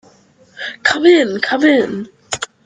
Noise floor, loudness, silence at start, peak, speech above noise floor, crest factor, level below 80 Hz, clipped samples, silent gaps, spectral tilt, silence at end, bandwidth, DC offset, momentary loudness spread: -49 dBFS; -14 LUFS; 0.55 s; 0 dBFS; 36 dB; 16 dB; -60 dBFS; under 0.1%; none; -3.5 dB/octave; 0.2 s; 9.6 kHz; under 0.1%; 17 LU